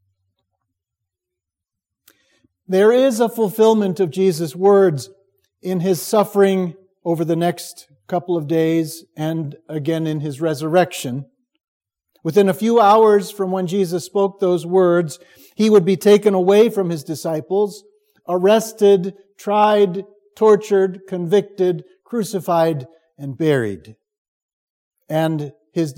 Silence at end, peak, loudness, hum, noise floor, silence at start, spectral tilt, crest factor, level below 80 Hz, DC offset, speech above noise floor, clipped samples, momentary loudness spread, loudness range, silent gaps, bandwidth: 0.05 s; 0 dBFS; -17 LUFS; none; -84 dBFS; 2.7 s; -6 dB/octave; 18 dB; -70 dBFS; under 0.1%; 68 dB; under 0.1%; 14 LU; 6 LU; 11.64-11.81 s, 24.18-24.91 s; 17 kHz